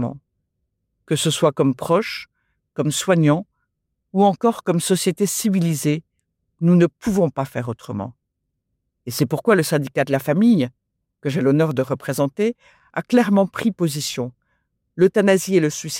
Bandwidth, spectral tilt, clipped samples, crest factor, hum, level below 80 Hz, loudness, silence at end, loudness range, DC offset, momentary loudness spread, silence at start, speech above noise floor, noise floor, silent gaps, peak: 16.5 kHz; -5.5 dB/octave; under 0.1%; 16 dB; none; -58 dBFS; -20 LUFS; 0 s; 3 LU; under 0.1%; 13 LU; 0 s; 58 dB; -76 dBFS; none; -4 dBFS